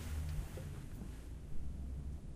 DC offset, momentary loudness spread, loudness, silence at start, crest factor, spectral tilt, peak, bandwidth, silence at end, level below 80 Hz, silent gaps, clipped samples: under 0.1%; 7 LU; -47 LUFS; 0 s; 14 dB; -6.5 dB/octave; -30 dBFS; 16 kHz; 0 s; -46 dBFS; none; under 0.1%